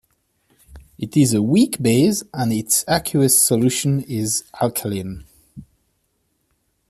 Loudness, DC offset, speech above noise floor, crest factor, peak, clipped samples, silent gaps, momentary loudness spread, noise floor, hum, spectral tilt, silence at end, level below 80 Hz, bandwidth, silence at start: -18 LUFS; under 0.1%; 50 dB; 18 dB; -2 dBFS; under 0.1%; none; 12 LU; -68 dBFS; none; -4.5 dB/octave; 1.25 s; -52 dBFS; 15 kHz; 0.7 s